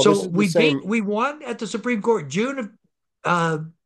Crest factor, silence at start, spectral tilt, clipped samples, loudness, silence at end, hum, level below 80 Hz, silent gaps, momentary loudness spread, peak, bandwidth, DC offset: 18 dB; 0 s; -5 dB/octave; under 0.1%; -22 LUFS; 0.15 s; none; -68 dBFS; none; 12 LU; -4 dBFS; 12.5 kHz; under 0.1%